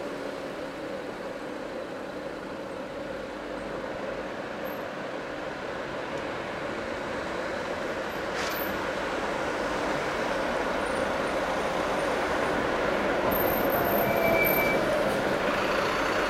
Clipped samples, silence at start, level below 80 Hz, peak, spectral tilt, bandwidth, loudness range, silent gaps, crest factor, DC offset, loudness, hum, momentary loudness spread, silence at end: under 0.1%; 0 s; -50 dBFS; -10 dBFS; -4.5 dB/octave; 16.5 kHz; 11 LU; none; 18 dB; under 0.1%; -29 LUFS; none; 11 LU; 0 s